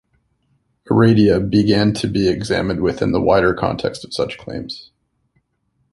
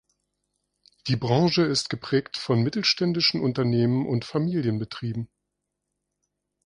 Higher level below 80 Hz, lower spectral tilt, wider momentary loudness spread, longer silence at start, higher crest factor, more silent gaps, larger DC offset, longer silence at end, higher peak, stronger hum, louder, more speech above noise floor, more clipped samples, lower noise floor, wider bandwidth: first, -40 dBFS vs -60 dBFS; first, -7 dB/octave vs -5.5 dB/octave; first, 14 LU vs 10 LU; second, 0.85 s vs 1.05 s; about the same, 18 dB vs 18 dB; neither; neither; second, 1.1 s vs 1.4 s; first, -2 dBFS vs -8 dBFS; second, none vs 50 Hz at -55 dBFS; first, -17 LUFS vs -24 LUFS; second, 51 dB vs 58 dB; neither; second, -67 dBFS vs -82 dBFS; about the same, 11.5 kHz vs 11 kHz